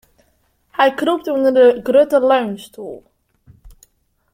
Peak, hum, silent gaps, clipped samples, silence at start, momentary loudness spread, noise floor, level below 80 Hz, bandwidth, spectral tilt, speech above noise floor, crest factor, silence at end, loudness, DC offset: -2 dBFS; none; none; under 0.1%; 0.8 s; 19 LU; -61 dBFS; -54 dBFS; 15.5 kHz; -5 dB/octave; 47 dB; 16 dB; 0.65 s; -15 LUFS; under 0.1%